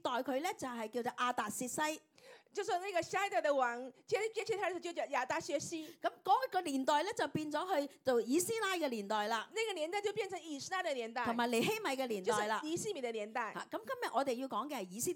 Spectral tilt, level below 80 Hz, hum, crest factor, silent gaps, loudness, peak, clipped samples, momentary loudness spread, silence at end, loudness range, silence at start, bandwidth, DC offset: -3 dB/octave; -84 dBFS; none; 18 dB; none; -37 LUFS; -18 dBFS; under 0.1%; 7 LU; 0 s; 2 LU; 0.05 s; 18 kHz; under 0.1%